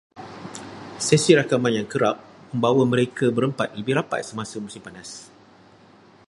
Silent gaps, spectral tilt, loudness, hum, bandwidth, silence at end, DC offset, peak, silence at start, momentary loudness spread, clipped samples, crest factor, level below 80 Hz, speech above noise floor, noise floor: none; -5 dB/octave; -22 LUFS; none; 11.5 kHz; 1.05 s; under 0.1%; -2 dBFS; 0.15 s; 20 LU; under 0.1%; 22 dB; -62 dBFS; 30 dB; -51 dBFS